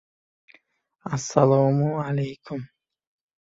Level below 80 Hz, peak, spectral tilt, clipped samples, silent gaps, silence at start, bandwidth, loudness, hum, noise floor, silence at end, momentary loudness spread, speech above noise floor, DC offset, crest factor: -62 dBFS; -2 dBFS; -7 dB/octave; under 0.1%; none; 1.05 s; 7.8 kHz; -23 LUFS; none; -65 dBFS; 0.75 s; 17 LU; 43 dB; under 0.1%; 22 dB